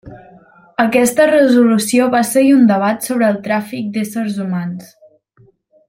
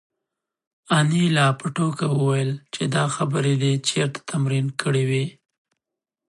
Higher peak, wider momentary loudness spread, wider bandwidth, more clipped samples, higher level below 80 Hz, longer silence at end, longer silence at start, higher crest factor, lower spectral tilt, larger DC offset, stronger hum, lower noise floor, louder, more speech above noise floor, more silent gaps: first, -2 dBFS vs -6 dBFS; first, 12 LU vs 7 LU; first, 16.5 kHz vs 11.5 kHz; neither; first, -58 dBFS vs -66 dBFS; about the same, 1.05 s vs 0.95 s; second, 0.05 s vs 0.9 s; about the same, 14 dB vs 16 dB; about the same, -5 dB/octave vs -5.5 dB/octave; neither; neither; second, -52 dBFS vs -86 dBFS; first, -14 LUFS vs -22 LUFS; second, 38 dB vs 65 dB; neither